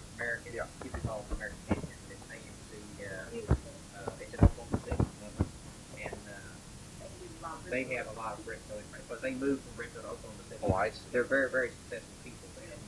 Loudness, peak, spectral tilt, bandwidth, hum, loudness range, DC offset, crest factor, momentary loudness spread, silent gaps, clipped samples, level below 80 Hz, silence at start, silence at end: -36 LUFS; -8 dBFS; -6 dB/octave; 12 kHz; none; 6 LU; under 0.1%; 28 dB; 18 LU; none; under 0.1%; -46 dBFS; 0 s; 0 s